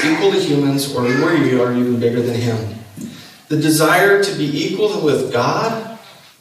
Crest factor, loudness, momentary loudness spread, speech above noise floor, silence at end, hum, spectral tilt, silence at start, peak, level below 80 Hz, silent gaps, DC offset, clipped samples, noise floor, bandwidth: 14 dB; -16 LUFS; 15 LU; 22 dB; 0.3 s; none; -5 dB/octave; 0 s; -2 dBFS; -60 dBFS; none; under 0.1%; under 0.1%; -38 dBFS; 15.5 kHz